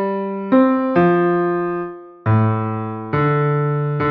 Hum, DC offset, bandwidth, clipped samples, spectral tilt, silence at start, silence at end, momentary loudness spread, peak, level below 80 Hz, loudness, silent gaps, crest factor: none; under 0.1%; 4.9 kHz; under 0.1%; -11 dB/octave; 0 s; 0 s; 10 LU; -2 dBFS; -52 dBFS; -18 LUFS; none; 14 dB